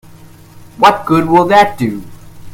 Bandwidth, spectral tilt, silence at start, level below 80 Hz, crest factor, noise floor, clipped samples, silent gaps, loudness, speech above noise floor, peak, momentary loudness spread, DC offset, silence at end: 16.5 kHz; -6 dB/octave; 0.55 s; -42 dBFS; 14 dB; -37 dBFS; 0.4%; none; -11 LUFS; 27 dB; 0 dBFS; 11 LU; under 0.1%; 0 s